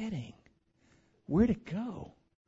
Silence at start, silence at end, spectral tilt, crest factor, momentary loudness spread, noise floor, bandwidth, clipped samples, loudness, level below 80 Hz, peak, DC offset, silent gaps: 0 s; 0.35 s; -8.5 dB/octave; 22 dB; 22 LU; -68 dBFS; 7.8 kHz; under 0.1%; -33 LUFS; -54 dBFS; -14 dBFS; under 0.1%; none